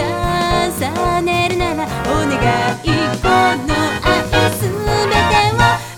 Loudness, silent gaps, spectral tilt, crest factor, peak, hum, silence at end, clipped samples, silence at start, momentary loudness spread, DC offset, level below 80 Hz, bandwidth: -15 LUFS; none; -4.5 dB/octave; 16 dB; 0 dBFS; none; 0 s; under 0.1%; 0 s; 5 LU; under 0.1%; -30 dBFS; 19 kHz